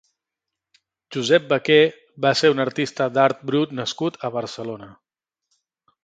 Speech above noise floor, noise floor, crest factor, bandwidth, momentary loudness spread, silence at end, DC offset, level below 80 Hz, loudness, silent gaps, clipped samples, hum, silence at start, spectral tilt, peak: 65 dB; -85 dBFS; 20 dB; 9.2 kHz; 14 LU; 1.1 s; under 0.1%; -68 dBFS; -20 LUFS; none; under 0.1%; none; 1.1 s; -5 dB/octave; -2 dBFS